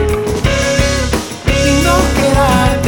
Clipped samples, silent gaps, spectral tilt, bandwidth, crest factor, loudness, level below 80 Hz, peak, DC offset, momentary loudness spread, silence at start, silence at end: under 0.1%; none; -4.5 dB/octave; 19.5 kHz; 12 dB; -13 LUFS; -20 dBFS; 0 dBFS; under 0.1%; 5 LU; 0 s; 0 s